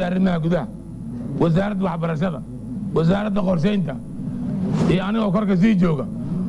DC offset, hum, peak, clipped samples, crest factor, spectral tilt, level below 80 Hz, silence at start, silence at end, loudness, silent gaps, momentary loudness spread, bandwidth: under 0.1%; none; -6 dBFS; under 0.1%; 14 dB; -8.5 dB/octave; -42 dBFS; 0 s; 0 s; -21 LUFS; none; 12 LU; 11 kHz